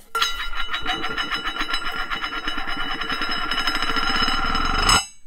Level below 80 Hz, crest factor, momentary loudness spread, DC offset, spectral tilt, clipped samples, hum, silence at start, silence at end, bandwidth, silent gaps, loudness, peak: -30 dBFS; 20 dB; 8 LU; under 0.1%; -1.5 dB/octave; under 0.1%; none; 0.1 s; 0 s; 16 kHz; none; -23 LUFS; -2 dBFS